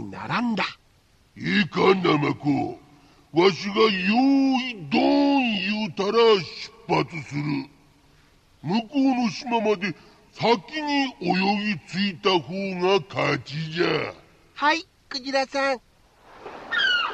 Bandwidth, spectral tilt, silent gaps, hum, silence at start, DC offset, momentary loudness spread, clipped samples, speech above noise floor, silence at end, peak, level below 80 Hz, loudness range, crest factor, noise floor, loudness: 8.6 kHz; -5.5 dB/octave; none; none; 0 s; under 0.1%; 12 LU; under 0.1%; 36 dB; 0 s; -6 dBFS; -62 dBFS; 5 LU; 18 dB; -59 dBFS; -23 LUFS